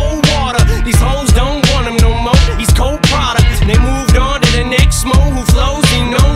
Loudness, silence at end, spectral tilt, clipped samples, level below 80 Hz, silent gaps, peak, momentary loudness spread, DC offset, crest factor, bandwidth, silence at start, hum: -11 LUFS; 0 s; -4.5 dB/octave; under 0.1%; -14 dBFS; none; 0 dBFS; 2 LU; under 0.1%; 10 dB; 16 kHz; 0 s; none